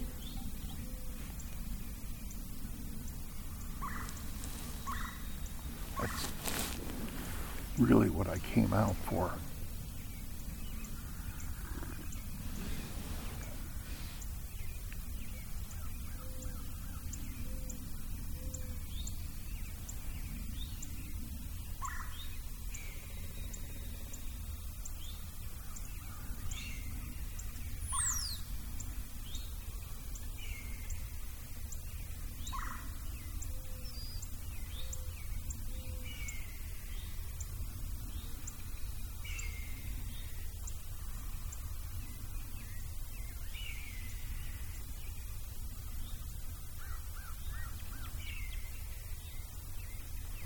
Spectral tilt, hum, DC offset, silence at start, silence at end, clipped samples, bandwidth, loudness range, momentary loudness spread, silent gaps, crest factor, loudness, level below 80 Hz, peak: -4.5 dB/octave; none; under 0.1%; 0 s; 0 s; under 0.1%; 19 kHz; 11 LU; 8 LU; none; 28 dB; -42 LUFS; -42 dBFS; -12 dBFS